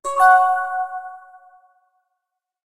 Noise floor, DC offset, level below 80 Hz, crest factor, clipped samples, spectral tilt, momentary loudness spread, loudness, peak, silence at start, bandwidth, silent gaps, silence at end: -81 dBFS; under 0.1%; -66 dBFS; 18 dB; under 0.1%; 0 dB/octave; 20 LU; -17 LUFS; -2 dBFS; 0.05 s; 13 kHz; none; 1.45 s